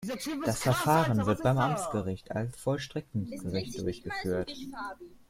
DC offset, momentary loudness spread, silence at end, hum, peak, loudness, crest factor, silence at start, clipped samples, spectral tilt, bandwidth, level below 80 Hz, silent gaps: under 0.1%; 12 LU; 0.15 s; none; -12 dBFS; -31 LUFS; 20 dB; 0 s; under 0.1%; -5.5 dB/octave; 16.5 kHz; -56 dBFS; none